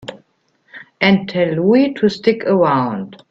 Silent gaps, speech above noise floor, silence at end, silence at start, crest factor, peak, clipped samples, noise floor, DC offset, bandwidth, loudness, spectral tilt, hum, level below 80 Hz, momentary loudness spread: none; 46 dB; 0.15 s; 0.05 s; 16 dB; 0 dBFS; under 0.1%; -60 dBFS; under 0.1%; 7.6 kHz; -15 LUFS; -7.5 dB/octave; none; -56 dBFS; 8 LU